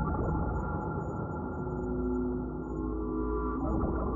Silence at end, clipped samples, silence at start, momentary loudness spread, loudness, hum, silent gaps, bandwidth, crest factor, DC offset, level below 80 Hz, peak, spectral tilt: 0 s; under 0.1%; 0 s; 4 LU; -34 LUFS; none; none; 7.2 kHz; 14 dB; under 0.1%; -38 dBFS; -18 dBFS; -12 dB/octave